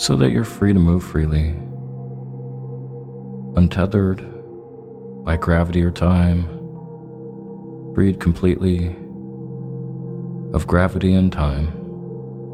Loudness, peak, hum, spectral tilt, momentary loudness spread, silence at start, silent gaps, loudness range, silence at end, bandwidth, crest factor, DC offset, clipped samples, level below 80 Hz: -19 LUFS; -2 dBFS; none; -7 dB/octave; 18 LU; 0 s; none; 3 LU; 0 s; 13 kHz; 18 dB; under 0.1%; under 0.1%; -32 dBFS